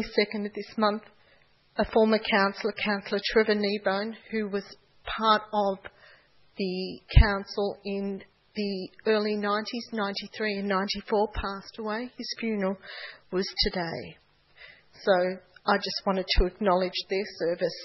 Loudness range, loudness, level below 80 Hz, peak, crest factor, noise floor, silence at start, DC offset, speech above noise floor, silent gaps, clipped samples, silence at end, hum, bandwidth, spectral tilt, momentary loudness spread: 4 LU; -28 LUFS; -36 dBFS; -4 dBFS; 24 dB; -62 dBFS; 0 s; under 0.1%; 35 dB; none; under 0.1%; 0 s; none; 6 kHz; -6.5 dB/octave; 12 LU